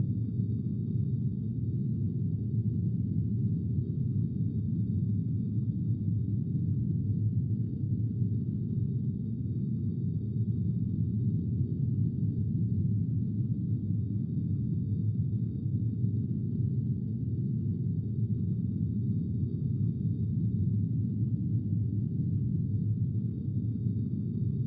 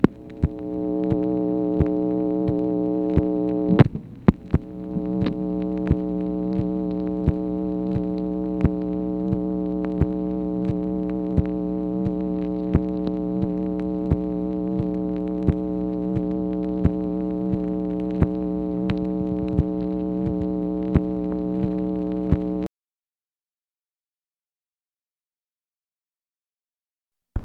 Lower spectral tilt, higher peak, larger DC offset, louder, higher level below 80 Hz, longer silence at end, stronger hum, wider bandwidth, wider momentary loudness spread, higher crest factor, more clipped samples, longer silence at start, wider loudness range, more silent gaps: first, -15.5 dB/octave vs -11 dB/octave; second, -18 dBFS vs 0 dBFS; neither; second, -31 LUFS vs -24 LUFS; second, -50 dBFS vs -38 dBFS; about the same, 0 s vs 0 s; neither; second, 0.8 kHz vs 4.9 kHz; about the same, 2 LU vs 4 LU; second, 12 dB vs 24 dB; neither; about the same, 0 s vs 0 s; second, 1 LU vs 4 LU; neither